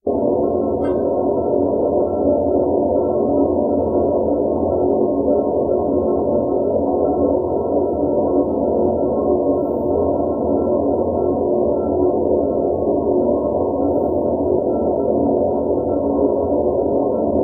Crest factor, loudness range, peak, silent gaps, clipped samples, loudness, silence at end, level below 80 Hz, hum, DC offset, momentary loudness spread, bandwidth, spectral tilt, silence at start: 14 dB; 1 LU; -4 dBFS; none; under 0.1%; -18 LUFS; 0 s; -40 dBFS; none; 0.1%; 2 LU; 2.2 kHz; -13 dB/octave; 0.05 s